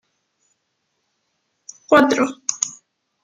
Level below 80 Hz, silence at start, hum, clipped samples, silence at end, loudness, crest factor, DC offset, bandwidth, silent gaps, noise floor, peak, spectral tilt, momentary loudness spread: -64 dBFS; 1.9 s; none; under 0.1%; 0.55 s; -18 LUFS; 20 dB; under 0.1%; 14 kHz; none; -72 dBFS; -2 dBFS; -2.5 dB/octave; 11 LU